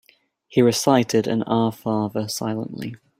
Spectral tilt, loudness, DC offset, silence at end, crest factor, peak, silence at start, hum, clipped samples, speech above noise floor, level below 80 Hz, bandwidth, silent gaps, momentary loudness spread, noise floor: -5.5 dB/octave; -21 LUFS; under 0.1%; 0.25 s; 20 dB; -2 dBFS; 0.5 s; none; under 0.1%; 35 dB; -60 dBFS; 16 kHz; none; 10 LU; -56 dBFS